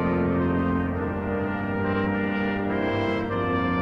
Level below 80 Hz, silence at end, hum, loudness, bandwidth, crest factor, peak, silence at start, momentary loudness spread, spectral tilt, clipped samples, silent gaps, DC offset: -44 dBFS; 0 s; none; -25 LUFS; 6.6 kHz; 12 dB; -12 dBFS; 0 s; 4 LU; -9 dB/octave; under 0.1%; none; under 0.1%